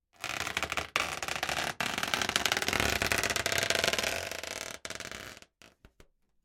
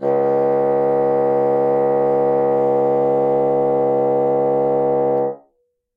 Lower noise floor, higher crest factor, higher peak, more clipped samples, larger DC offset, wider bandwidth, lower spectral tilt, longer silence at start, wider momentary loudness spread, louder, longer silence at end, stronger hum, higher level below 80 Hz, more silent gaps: about the same, -63 dBFS vs -66 dBFS; first, 28 dB vs 10 dB; about the same, -6 dBFS vs -8 dBFS; neither; neither; first, 17 kHz vs 3.2 kHz; second, -1.5 dB/octave vs -10 dB/octave; first, 0.2 s vs 0 s; first, 12 LU vs 1 LU; second, -31 LUFS vs -17 LUFS; first, 0.75 s vs 0.6 s; neither; first, -54 dBFS vs -62 dBFS; neither